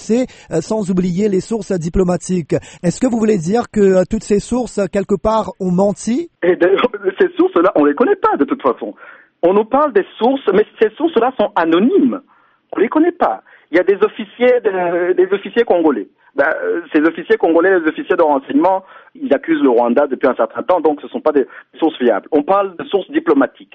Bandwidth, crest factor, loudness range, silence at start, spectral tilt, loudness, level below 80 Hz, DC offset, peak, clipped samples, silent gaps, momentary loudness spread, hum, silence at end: 8.8 kHz; 12 dB; 2 LU; 0 s; -6.5 dB/octave; -15 LUFS; -42 dBFS; under 0.1%; -2 dBFS; under 0.1%; none; 6 LU; none; 0.1 s